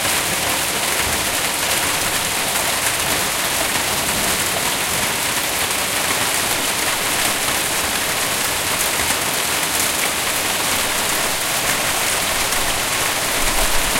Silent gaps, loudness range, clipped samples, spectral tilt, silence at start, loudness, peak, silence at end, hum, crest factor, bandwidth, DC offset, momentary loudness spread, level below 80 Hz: none; 0 LU; under 0.1%; -1 dB/octave; 0 s; -17 LUFS; -2 dBFS; 0 s; none; 16 dB; 17 kHz; under 0.1%; 1 LU; -36 dBFS